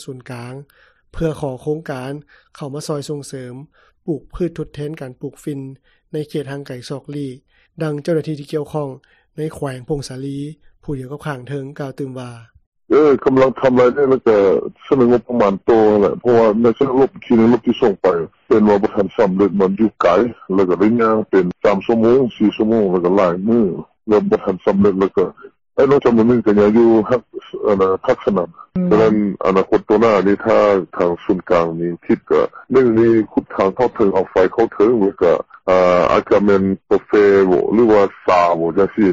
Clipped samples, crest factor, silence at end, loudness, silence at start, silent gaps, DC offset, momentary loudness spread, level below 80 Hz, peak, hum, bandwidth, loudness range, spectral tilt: under 0.1%; 12 dB; 0 s; -15 LUFS; 0 s; 12.67-12.72 s; under 0.1%; 15 LU; -46 dBFS; -4 dBFS; none; 11.5 kHz; 13 LU; -7.5 dB/octave